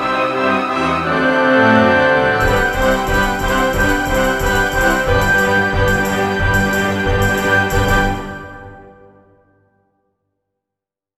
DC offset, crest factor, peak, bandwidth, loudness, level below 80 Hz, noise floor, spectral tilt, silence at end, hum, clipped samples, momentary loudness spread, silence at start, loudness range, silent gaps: under 0.1%; 16 dB; 0 dBFS; 15 kHz; -14 LUFS; -28 dBFS; -85 dBFS; -5 dB/octave; 2.3 s; none; under 0.1%; 5 LU; 0 s; 6 LU; none